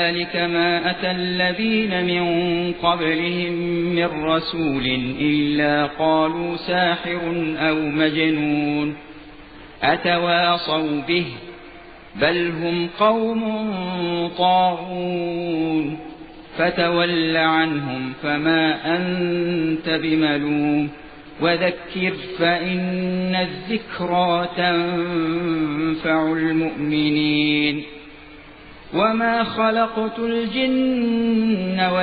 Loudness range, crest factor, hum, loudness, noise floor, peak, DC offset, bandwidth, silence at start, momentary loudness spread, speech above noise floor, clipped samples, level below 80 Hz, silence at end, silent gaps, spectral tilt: 2 LU; 18 dB; none; -20 LUFS; -42 dBFS; -4 dBFS; under 0.1%; 4.9 kHz; 0 s; 7 LU; 22 dB; under 0.1%; -50 dBFS; 0 s; none; -8.5 dB/octave